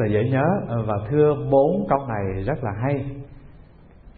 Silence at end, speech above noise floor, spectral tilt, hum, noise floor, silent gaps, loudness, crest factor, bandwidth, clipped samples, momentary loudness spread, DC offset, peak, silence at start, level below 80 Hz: 0.05 s; 26 dB; -13 dB/octave; none; -47 dBFS; none; -22 LUFS; 18 dB; 4.5 kHz; under 0.1%; 8 LU; 0.1%; -4 dBFS; 0 s; -44 dBFS